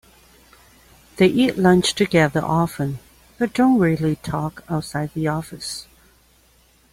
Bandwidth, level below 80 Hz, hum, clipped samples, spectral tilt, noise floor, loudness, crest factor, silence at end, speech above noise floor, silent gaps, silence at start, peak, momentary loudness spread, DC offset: 16 kHz; -50 dBFS; none; under 0.1%; -5.5 dB/octave; -56 dBFS; -20 LUFS; 18 dB; 1.1 s; 37 dB; none; 1.15 s; -4 dBFS; 12 LU; under 0.1%